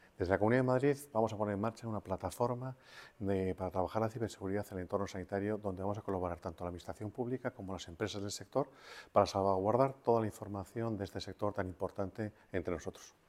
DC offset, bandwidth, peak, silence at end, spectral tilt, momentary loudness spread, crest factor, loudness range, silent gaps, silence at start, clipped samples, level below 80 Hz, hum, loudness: under 0.1%; 16 kHz; -12 dBFS; 0.2 s; -6.5 dB/octave; 12 LU; 24 dB; 5 LU; none; 0.2 s; under 0.1%; -64 dBFS; none; -37 LUFS